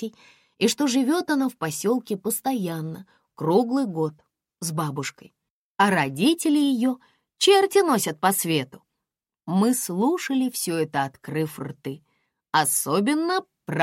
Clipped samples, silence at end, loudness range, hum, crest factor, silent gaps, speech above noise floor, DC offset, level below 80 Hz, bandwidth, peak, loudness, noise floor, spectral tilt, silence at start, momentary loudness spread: under 0.1%; 0 s; 5 LU; none; 18 dB; 5.50-5.75 s; 63 dB; under 0.1%; -72 dBFS; 16.5 kHz; -6 dBFS; -23 LUFS; -86 dBFS; -4 dB/octave; 0 s; 14 LU